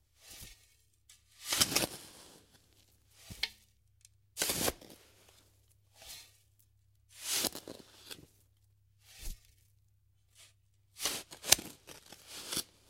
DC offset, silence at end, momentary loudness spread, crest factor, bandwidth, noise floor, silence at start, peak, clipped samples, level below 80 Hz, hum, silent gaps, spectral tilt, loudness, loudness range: under 0.1%; 0.25 s; 25 LU; 38 dB; 16 kHz; -71 dBFS; 0.25 s; -2 dBFS; under 0.1%; -60 dBFS; none; none; -0.5 dB/octave; -33 LUFS; 9 LU